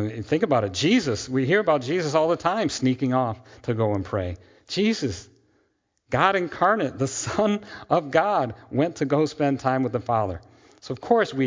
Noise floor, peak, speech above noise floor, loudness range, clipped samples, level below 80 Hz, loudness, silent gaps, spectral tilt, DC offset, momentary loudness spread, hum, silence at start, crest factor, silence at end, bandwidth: -70 dBFS; -4 dBFS; 47 dB; 4 LU; under 0.1%; -50 dBFS; -24 LUFS; none; -5.5 dB/octave; under 0.1%; 9 LU; none; 0 s; 20 dB; 0 s; 7.6 kHz